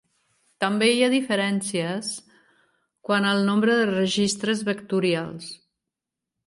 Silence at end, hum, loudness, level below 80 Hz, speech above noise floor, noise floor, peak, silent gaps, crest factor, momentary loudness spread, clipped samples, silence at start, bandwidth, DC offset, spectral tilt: 0.9 s; none; -23 LUFS; -68 dBFS; 63 dB; -86 dBFS; -8 dBFS; none; 16 dB; 13 LU; under 0.1%; 0.6 s; 11.5 kHz; under 0.1%; -4.5 dB/octave